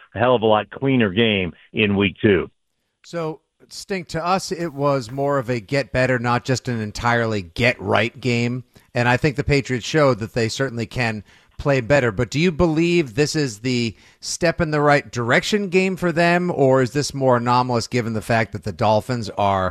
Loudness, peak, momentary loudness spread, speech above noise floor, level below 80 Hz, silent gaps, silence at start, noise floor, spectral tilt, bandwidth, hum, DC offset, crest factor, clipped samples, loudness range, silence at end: -20 LUFS; -2 dBFS; 9 LU; 53 dB; -44 dBFS; none; 0.15 s; -73 dBFS; -5.5 dB/octave; 14 kHz; none; under 0.1%; 18 dB; under 0.1%; 4 LU; 0 s